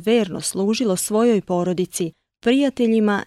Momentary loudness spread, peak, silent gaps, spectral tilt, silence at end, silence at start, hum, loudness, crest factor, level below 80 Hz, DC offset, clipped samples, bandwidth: 7 LU; -6 dBFS; none; -5 dB/octave; 0 s; 0 s; none; -20 LUFS; 14 dB; -58 dBFS; under 0.1%; under 0.1%; 15 kHz